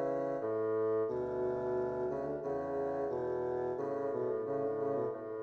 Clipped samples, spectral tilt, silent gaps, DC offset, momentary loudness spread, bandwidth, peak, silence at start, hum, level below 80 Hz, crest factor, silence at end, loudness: under 0.1%; -9.5 dB/octave; none; under 0.1%; 3 LU; 6.6 kHz; -24 dBFS; 0 s; none; -66 dBFS; 10 dB; 0 s; -36 LUFS